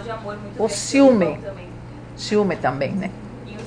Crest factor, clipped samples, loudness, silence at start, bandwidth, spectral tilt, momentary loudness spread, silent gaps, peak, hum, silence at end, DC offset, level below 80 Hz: 18 dB; under 0.1%; -20 LUFS; 0 s; 10 kHz; -5.5 dB/octave; 21 LU; none; -4 dBFS; 60 Hz at -40 dBFS; 0 s; under 0.1%; -46 dBFS